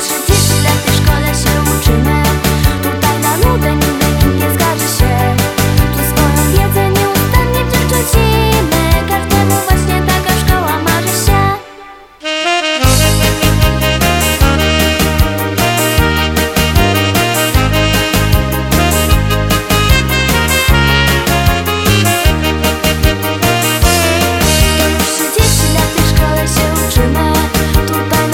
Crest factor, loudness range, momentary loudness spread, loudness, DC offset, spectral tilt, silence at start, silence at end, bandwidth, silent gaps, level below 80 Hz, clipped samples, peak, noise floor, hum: 10 dB; 1 LU; 3 LU; -11 LUFS; under 0.1%; -4 dB/octave; 0 s; 0 s; 18.5 kHz; none; -18 dBFS; under 0.1%; 0 dBFS; -34 dBFS; none